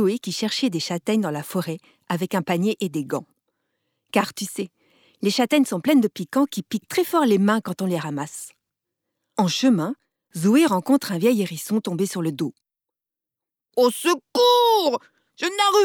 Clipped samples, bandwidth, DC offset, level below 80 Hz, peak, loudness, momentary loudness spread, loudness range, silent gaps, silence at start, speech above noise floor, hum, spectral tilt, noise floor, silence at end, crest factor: under 0.1%; 19 kHz; under 0.1%; -74 dBFS; -6 dBFS; -22 LUFS; 12 LU; 5 LU; none; 0 s; 65 dB; none; -5 dB/octave; -87 dBFS; 0 s; 18 dB